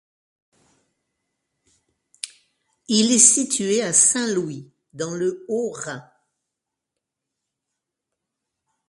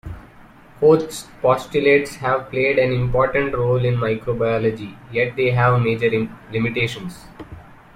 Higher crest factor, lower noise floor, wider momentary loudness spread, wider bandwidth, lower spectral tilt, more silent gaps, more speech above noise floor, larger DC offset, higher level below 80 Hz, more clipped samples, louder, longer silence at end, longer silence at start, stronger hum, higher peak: first, 24 dB vs 16 dB; first, -83 dBFS vs -45 dBFS; first, 22 LU vs 17 LU; second, 11.5 kHz vs 14.5 kHz; second, -2 dB/octave vs -6.5 dB/octave; neither; first, 63 dB vs 26 dB; neither; second, -70 dBFS vs -44 dBFS; neither; about the same, -18 LUFS vs -19 LUFS; first, 2.9 s vs 0.2 s; first, 2.25 s vs 0.05 s; neither; first, 0 dBFS vs -4 dBFS